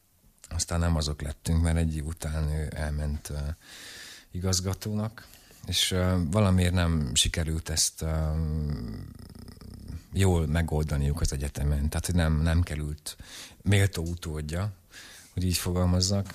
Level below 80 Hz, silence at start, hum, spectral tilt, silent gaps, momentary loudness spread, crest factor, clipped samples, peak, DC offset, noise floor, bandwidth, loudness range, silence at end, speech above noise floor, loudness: -36 dBFS; 0.5 s; none; -4.5 dB/octave; none; 18 LU; 18 dB; under 0.1%; -10 dBFS; under 0.1%; -56 dBFS; 15.5 kHz; 5 LU; 0 s; 29 dB; -28 LUFS